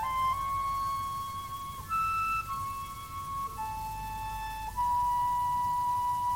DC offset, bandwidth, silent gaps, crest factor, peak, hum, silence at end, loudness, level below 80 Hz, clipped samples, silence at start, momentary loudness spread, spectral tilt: under 0.1%; 16.5 kHz; none; 10 dB; -22 dBFS; none; 0 s; -32 LUFS; -50 dBFS; under 0.1%; 0 s; 9 LU; -3 dB/octave